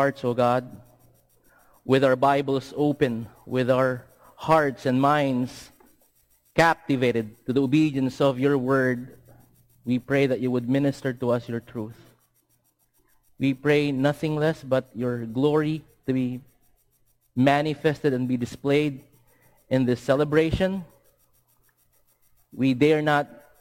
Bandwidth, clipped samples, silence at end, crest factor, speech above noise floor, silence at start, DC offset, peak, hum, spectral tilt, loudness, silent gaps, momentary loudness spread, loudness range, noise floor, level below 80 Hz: 16.5 kHz; under 0.1%; 0.25 s; 18 dB; 44 dB; 0 s; under 0.1%; -6 dBFS; none; -7 dB/octave; -24 LUFS; none; 12 LU; 4 LU; -68 dBFS; -54 dBFS